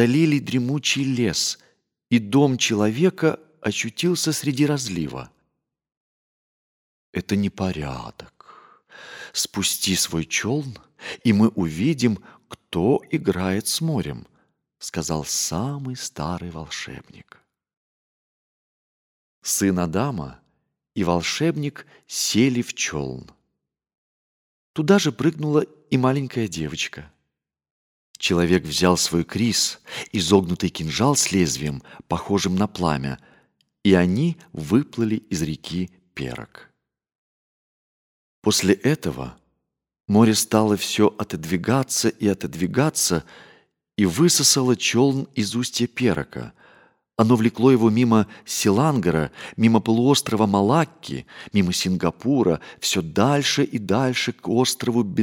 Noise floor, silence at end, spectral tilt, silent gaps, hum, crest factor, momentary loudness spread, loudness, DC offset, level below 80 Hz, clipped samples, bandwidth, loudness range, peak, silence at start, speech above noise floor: -80 dBFS; 0 s; -4.5 dB/octave; 5.97-7.13 s, 17.77-19.42 s, 23.98-24.74 s, 27.71-28.14 s, 37.15-38.42 s; none; 20 dB; 14 LU; -21 LUFS; under 0.1%; -52 dBFS; under 0.1%; 19 kHz; 8 LU; -2 dBFS; 0 s; 58 dB